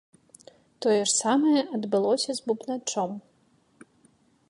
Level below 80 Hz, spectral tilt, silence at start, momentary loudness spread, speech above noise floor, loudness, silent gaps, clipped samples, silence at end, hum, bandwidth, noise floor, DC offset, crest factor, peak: -80 dBFS; -3 dB/octave; 0.8 s; 8 LU; 40 dB; -25 LUFS; none; under 0.1%; 1.3 s; none; 11.5 kHz; -65 dBFS; under 0.1%; 16 dB; -12 dBFS